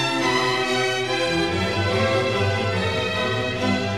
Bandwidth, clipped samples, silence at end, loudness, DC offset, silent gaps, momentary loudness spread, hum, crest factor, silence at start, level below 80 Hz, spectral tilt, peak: 14 kHz; under 0.1%; 0 s; -21 LUFS; 0.4%; none; 2 LU; none; 14 dB; 0 s; -48 dBFS; -4.5 dB/octave; -8 dBFS